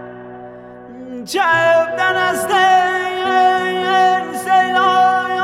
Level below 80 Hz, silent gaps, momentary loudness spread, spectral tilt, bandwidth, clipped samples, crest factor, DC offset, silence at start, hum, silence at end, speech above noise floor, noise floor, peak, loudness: -60 dBFS; none; 20 LU; -3 dB/octave; 14.5 kHz; under 0.1%; 14 dB; under 0.1%; 0 s; none; 0 s; 21 dB; -35 dBFS; -2 dBFS; -14 LUFS